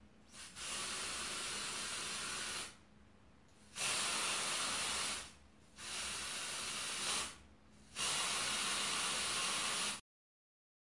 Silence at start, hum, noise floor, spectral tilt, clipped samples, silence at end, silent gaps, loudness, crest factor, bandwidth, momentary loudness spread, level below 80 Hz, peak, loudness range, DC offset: 0 s; none; -65 dBFS; 0.5 dB/octave; under 0.1%; 1 s; none; -38 LUFS; 16 dB; 11.5 kHz; 13 LU; -68 dBFS; -26 dBFS; 5 LU; under 0.1%